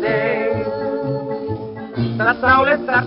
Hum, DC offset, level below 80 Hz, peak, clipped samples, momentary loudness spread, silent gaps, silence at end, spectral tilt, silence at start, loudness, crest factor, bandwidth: none; under 0.1%; -48 dBFS; -2 dBFS; under 0.1%; 12 LU; none; 0 s; -4.5 dB/octave; 0 s; -18 LUFS; 16 dB; 5.6 kHz